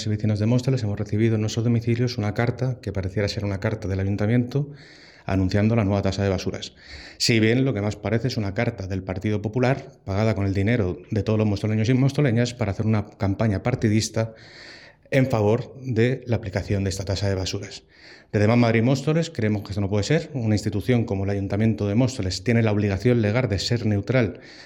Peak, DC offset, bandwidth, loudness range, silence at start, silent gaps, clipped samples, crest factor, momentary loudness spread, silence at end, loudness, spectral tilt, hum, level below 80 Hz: -4 dBFS; under 0.1%; 11.5 kHz; 2 LU; 0 s; none; under 0.1%; 18 dB; 8 LU; 0 s; -23 LUFS; -6.5 dB/octave; none; -52 dBFS